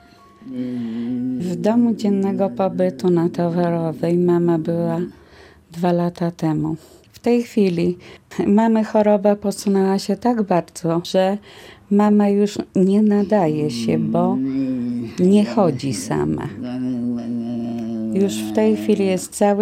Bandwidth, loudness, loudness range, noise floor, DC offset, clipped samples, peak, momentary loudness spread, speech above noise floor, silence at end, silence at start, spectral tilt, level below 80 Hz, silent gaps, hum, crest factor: 15 kHz; -19 LUFS; 4 LU; -46 dBFS; under 0.1%; under 0.1%; -2 dBFS; 10 LU; 28 dB; 0 s; 0.4 s; -7 dB/octave; -54 dBFS; none; none; 16 dB